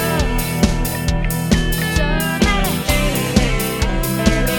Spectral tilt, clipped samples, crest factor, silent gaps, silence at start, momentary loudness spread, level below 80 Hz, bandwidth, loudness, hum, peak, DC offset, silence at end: -4.5 dB/octave; under 0.1%; 16 dB; none; 0 s; 3 LU; -22 dBFS; 17.5 kHz; -18 LUFS; none; 0 dBFS; under 0.1%; 0 s